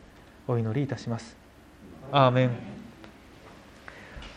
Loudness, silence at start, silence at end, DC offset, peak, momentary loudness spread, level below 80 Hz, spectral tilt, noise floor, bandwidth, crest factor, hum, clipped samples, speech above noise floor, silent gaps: -27 LUFS; 0.5 s; 0 s; under 0.1%; -6 dBFS; 27 LU; -56 dBFS; -7 dB/octave; -51 dBFS; 9.4 kHz; 24 dB; none; under 0.1%; 25 dB; none